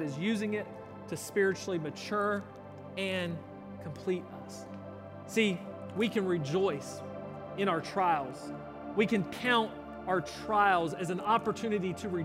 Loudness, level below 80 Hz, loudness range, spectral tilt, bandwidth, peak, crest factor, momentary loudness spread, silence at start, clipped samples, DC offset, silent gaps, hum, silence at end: -32 LUFS; -66 dBFS; 6 LU; -5.5 dB/octave; 16 kHz; -14 dBFS; 20 dB; 16 LU; 0 s; under 0.1%; under 0.1%; none; none; 0 s